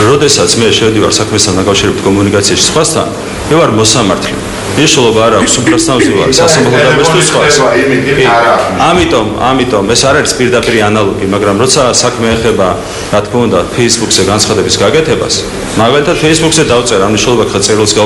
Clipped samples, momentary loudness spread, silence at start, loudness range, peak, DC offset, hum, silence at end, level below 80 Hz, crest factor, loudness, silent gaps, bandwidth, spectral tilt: 0.8%; 5 LU; 0 s; 2 LU; 0 dBFS; under 0.1%; none; 0 s; -30 dBFS; 8 dB; -8 LUFS; none; over 20 kHz; -3.5 dB/octave